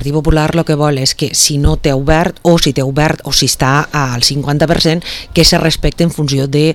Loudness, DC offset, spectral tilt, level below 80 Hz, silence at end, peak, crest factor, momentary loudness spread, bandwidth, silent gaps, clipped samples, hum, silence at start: -12 LUFS; under 0.1%; -4 dB/octave; -24 dBFS; 0 s; 0 dBFS; 12 dB; 4 LU; 18 kHz; none; 0.3%; none; 0 s